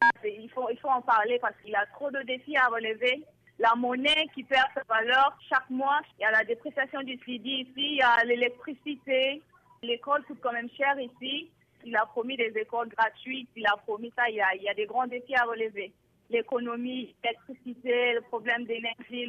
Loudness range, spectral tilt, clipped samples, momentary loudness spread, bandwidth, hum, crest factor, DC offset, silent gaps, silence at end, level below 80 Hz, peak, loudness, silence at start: 5 LU; -3.5 dB/octave; under 0.1%; 11 LU; 9.8 kHz; none; 16 dB; under 0.1%; none; 0 s; -72 dBFS; -12 dBFS; -28 LUFS; 0 s